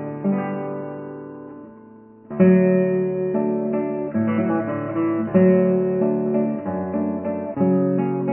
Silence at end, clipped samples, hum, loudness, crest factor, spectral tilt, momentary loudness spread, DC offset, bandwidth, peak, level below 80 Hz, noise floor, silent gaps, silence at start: 0 s; under 0.1%; none; -21 LUFS; 16 dB; -13.5 dB/octave; 17 LU; under 0.1%; 3.1 kHz; -4 dBFS; -56 dBFS; -45 dBFS; none; 0 s